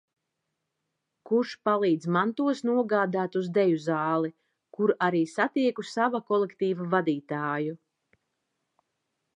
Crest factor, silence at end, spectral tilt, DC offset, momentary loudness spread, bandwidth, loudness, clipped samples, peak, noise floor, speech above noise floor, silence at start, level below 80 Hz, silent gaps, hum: 18 dB; 1.6 s; -7 dB/octave; under 0.1%; 5 LU; 10 kHz; -27 LUFS; under 0.1%; -10 dBFS; -82 dBFS; 56 dB; 1.3 s; -82 dBFS; none; none